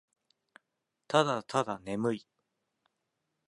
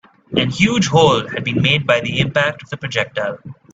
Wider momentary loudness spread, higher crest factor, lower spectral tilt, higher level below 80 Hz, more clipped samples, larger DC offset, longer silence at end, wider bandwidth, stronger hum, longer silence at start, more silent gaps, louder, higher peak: second, 7 LU vs 10 LU; first, 26 dB vs 18 dB; about the same, -5 dB/octave vs -5 dB/octave; second, -74 dBFS vs -48 dBFS; neither; neither; first, 1.3 s vs 0.2 s; first, 11.5 kHz vs 8 kHz; neither; first, 1.1 s vs 0.3 s; neither; second, -32 LUFS vs -16 LUFS; second, -10 dBFS vs 0 dBFS